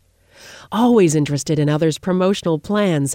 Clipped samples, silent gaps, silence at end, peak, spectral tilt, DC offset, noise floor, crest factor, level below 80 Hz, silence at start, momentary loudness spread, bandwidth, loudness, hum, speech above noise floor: under 0.1%; none; 0 s; -4 dBFS; -6 dB/octave; under 0.1%; -46 dBFS; 14 dB; -52 dBFS; 0.45 s; 6 LU; 16 kHz; -17 LUFS; none; 30 dB